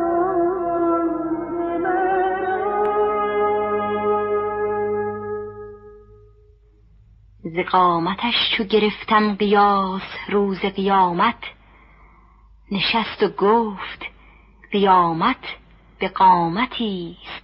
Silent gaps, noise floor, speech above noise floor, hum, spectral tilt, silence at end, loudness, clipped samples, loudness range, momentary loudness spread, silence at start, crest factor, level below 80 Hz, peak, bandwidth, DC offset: none; -52 dBFS; 33 dB; none; -3 dB/octave; 0.05 s; -20 LUFS; under 0.1%; 6 LU; 14 LU; 0 s; 18 dB; -50 dBFS; -4 dBFS; 5.8 kHz; under 0.1%